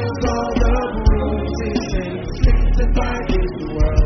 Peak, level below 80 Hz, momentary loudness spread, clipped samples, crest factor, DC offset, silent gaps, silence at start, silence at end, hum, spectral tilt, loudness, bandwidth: -2 dBFS; -18 dBFS; 5 LU; under 0.1%; 16 dB; under 0.1%; none; 0 s; 0 s; none; -6.5 dB/octave; -20 LUFS; 6.4 kHz